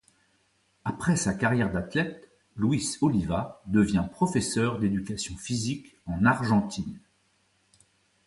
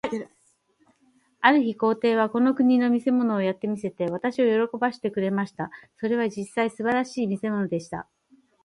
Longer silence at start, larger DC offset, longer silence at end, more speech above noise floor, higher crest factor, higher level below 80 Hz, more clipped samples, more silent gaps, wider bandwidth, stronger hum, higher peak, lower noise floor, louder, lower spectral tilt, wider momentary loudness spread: first, 0.85 s vs 0.05 s; neither; first, 1.3 s vs 0.6 s; about the same, 42 dB vs 42 dB; about the same, 20 dB vs 22 dB; first, -50 dBFS vs -68 dBFS; neither; neither; about the same, 11.5 kHz vs 11 kHz; neither; second, -8 dBFS vs -2 dBFS; about the same, -69 dBFS vs -66 dBFS; second, -27 LUFS vs -24 LUFS; about the same, -5.5 dB/octave vs -6.5 dB/octave; about the same, 11 LU vs 12 LU